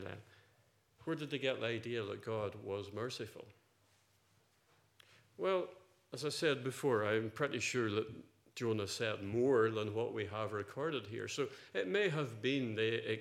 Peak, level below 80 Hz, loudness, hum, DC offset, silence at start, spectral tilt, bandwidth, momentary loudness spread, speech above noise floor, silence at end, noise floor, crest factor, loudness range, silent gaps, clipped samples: -20 dBFS; -82 dBFS; -38 LUFS; none; under 0.1%; 0 s; -5 dB/octave; 15 kHz; 10 LU; 36 dB; 0 s; -73 dBFS; 20 dB; 8 LU; none; under 0.1%